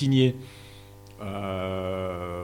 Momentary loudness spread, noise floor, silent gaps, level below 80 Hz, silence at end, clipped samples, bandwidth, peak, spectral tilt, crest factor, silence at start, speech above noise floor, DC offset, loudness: 24 LU; -47 dBFS; none; -56 dBFS; 0 s; under 0.1%; 15.5 kHz; -10 dBFS; -7 dB/octave; 18 dB; 0 s; 21 dB; under 0.1%; -28 LUFS